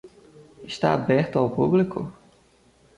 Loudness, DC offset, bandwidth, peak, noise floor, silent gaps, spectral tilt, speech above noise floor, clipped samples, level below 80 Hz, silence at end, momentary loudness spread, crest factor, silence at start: -23 LUFS; under 0.1%; 11 kHz; -8 dBFS; -58 dBFS; none; -7.5 dB/octave; 36 dB; under 0.1%; -58 dBFS; 0.85 s; 16 LU; 18 dB; 0.05 s